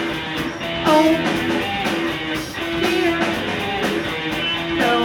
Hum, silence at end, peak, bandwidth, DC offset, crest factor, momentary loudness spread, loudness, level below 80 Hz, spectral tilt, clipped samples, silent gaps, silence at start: none; 0 s; -4 dBFS; 18.5 kHz; under 0.1%; 18 dB; 8 LU; -20 LUFS; -44 dBFS; -4.5 dB/octave; under 0.1%; none; 0 s